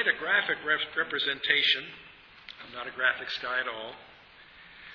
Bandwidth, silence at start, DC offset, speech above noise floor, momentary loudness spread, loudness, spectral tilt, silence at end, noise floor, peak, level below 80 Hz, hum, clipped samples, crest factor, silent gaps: 5.4 kHz; 0 s; under 0.1%; 24 dB; 23 LU; -27 LUFS; -3 dB/octave; 0 s; -53 dBFS; -8 dBFS; -68 dBFS; none; under 0.1%; 24 dB; none